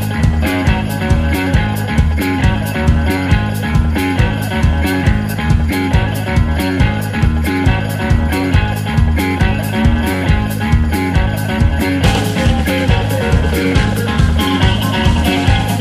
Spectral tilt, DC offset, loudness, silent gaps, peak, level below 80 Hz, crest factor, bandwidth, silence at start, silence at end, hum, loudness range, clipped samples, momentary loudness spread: -6 dB/octave; under 0.1%; -14 LUFS; none; 0 dBFS; -18 dBFS; 12 dB; 15.5 kHz; 0 s; 0 s; none; 1 LU; under 0.1%; 2 LU